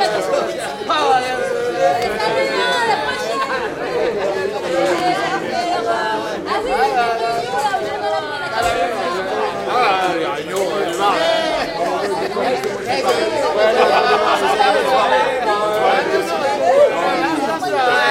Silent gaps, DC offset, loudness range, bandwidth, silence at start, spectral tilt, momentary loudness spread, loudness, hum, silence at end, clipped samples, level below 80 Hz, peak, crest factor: none; under 0.1%; 4 LU; 16 kHz; 0 s; -3.5 dB/octave; 6 LU; -17 LUFS; none; 0 s; under 0.1%; -50 dBFS; 0 dBFS; 16 dB